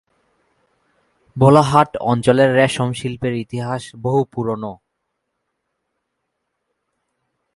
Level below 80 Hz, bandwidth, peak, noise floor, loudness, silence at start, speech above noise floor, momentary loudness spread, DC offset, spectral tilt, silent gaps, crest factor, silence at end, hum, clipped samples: -52 dBFS; 11.5 kHz; 0 dBFS; -75 dBFS; -17 LUFS; 1.35 s; 59 dB; 13 LU; under 0.1%; -6.5 dB/octave; none; 20 dB; 2.8 s; none; under 0.1%